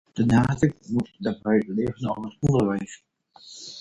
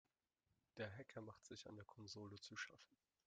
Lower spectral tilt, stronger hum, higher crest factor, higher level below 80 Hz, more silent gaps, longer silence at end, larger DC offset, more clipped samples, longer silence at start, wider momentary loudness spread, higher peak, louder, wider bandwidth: first, -7.5 dB/octave vs -4 dB/octave; neither; about the same, 18 dB vs 22 dB; first, -48 dBFS vs -88 dBFS; neither; second, 0 s vs 0.3 s; neither; neither; second, 0.15 s vs 0.75 s; first, 17 LU vs 7 LU; first, -6 dBFS vs -36 dBFS; first, -24 LUFS vs -56 LUFS; first, 10.5 kHz vs 9 kHz